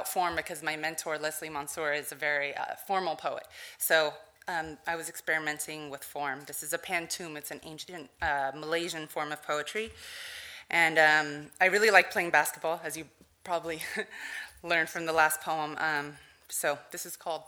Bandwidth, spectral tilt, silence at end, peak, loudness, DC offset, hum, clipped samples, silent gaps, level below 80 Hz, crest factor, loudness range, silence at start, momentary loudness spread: over 20 kHz; -2 dB/octave; 0 s; -6 dBFS; -30 LUFS; under 0.1%; none; under 0.1%; none; -66 dBFS; 26 dB; 9 LU; 0 s; 16 LU